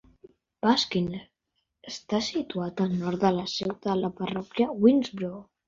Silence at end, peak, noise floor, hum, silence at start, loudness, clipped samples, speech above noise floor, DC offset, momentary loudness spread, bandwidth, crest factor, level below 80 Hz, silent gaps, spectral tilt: 0.25 s; -8 dBFS; -79 dBFS; none; 0.65 s; -27 LUFS; under 0.1%; 53 dB; under 0.1%; 13 LU; 7.6 kHz; 20 dB; -62 dBFS; none; -5.5 dB/octave